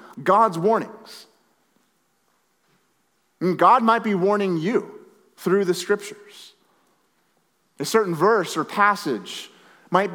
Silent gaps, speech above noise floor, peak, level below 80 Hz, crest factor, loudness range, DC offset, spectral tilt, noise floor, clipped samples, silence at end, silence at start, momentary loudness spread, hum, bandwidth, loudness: none; 47 dB; -2 dBFS; -86 dBFS; 20 dB; 6 LU; under 0.1%; -5 dB/octave; -68 dBFS; under 0.1%; 0 s; 0.15 s; 19 LU; none; 19 kHz; -21 LUFS